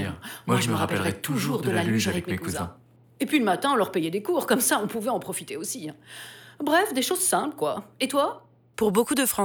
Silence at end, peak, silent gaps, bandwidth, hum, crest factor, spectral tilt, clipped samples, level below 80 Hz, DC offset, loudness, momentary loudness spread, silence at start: 0 s; -8 dBFS; none; over 20 kHz; none; 16 dB; -4 dB/octave; under 0.1%; -64 dBFS; under 0.1%; -25 LUFS; 13 LU; 0 s